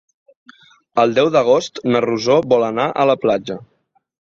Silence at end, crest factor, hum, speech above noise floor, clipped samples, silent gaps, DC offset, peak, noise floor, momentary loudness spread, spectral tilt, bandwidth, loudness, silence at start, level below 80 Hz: 0.6 s; 16 dB; none; 33 dB; under 0.1%; none; under 0.1%; -2 dBFS; -48 dBFS; 8 LU; -5.5 dB/octave; 7.4 kHz; -16 LUFS; 0.95 s; -58 dBFS